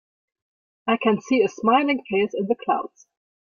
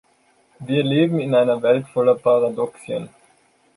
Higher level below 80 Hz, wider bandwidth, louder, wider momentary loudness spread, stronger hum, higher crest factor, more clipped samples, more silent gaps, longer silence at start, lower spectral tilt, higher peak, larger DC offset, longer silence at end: about the same, -66 dBFS vs -66 dBFS; second, 7.2 kHz vs 11 kHz; second, -22 LUFS vs -19 LUFS; second, 7 LU vs 12 LU; neither; about the same, 18 dB vs 16 dB; neither; neither; first, 0.85 s vs 0.6 s; second, -5.5 dB/octave vs -7.5 dB/octave; about the same, -6 dBFS vs -4 dBFS; neither; second, 0.55 s vs 0.7 s